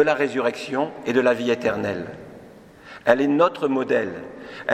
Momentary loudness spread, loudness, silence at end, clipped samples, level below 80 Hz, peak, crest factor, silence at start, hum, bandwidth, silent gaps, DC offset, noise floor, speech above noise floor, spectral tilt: 17 LU; -22 LUFS; 0 s; under 0.1%; -62 dBFS; -2 dBFS; 22 dB; 0 s; none; 13.5 kHz; none; under 0.1%; -45 dBFS; 24 dB; -5.5 dB/octave